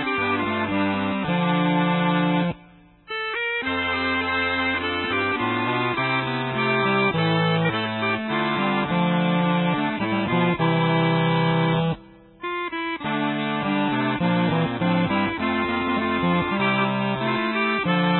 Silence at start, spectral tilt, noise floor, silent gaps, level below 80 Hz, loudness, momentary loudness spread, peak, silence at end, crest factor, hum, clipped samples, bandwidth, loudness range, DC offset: 0 s; -11 dB/octave; -50 dBFS; none; -50 dBFS; -22 LUFS; 4 LU; -8 dBFS; 0 s; 14 dB; none; under 0.1%; 4.3 kHz; 2 LU; under 0.1%